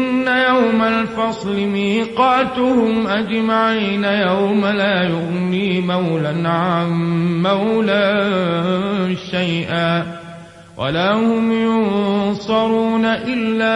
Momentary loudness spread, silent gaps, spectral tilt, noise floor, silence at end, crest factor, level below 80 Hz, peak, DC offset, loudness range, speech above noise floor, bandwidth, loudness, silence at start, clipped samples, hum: 5 LU; none; -7 dB/octave; -37 dBFS; 0 s; 14 dB; -52 dBFS; -2 dBFS; under 0.1%; 2 LU; 20 dB; 10.5 kHz; -17 LUFS; 0 s; under 0.1%; none